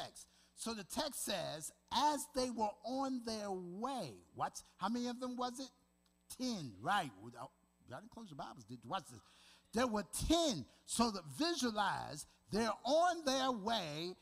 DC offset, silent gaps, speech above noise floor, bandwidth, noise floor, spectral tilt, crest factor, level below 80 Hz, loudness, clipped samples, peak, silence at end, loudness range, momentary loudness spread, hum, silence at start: under 0.1%; none; 35 dB; 15.5 kHz; -75 dBFS; -3.5 dB/octave; 20 dB; -62 dBFS; -39 LUFS; under 0.1%; -20 dBFS; 0.1 s; 7 LU; 18 LU; none; 0 s